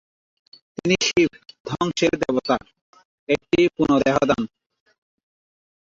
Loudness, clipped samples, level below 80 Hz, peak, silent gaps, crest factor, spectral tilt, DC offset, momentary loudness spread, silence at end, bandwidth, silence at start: -21 LUFS; under 0.1%; -52 dBFS; -4 dBFS; 1.60-1.65 s, 2.81-2.93 s, 3.05-3.27 s; 20 dB; -4.5 dB/octave; under 0.1%; 12 LU; 1.45 s; 7.6 kHz; 0.85 s